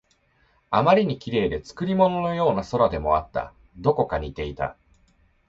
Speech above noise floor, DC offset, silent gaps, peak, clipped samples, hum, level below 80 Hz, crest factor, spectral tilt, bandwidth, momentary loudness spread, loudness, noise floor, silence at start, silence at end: 41 dB; under 0.1%; none; -6 dBFS; under 0.1%; none; -44 dBFS; 18 dB; -7.5 dB/octave; 7.8 kHz; 12 LU; -23 LUFS; -64 dBFS; 0.7 s; 0.75 s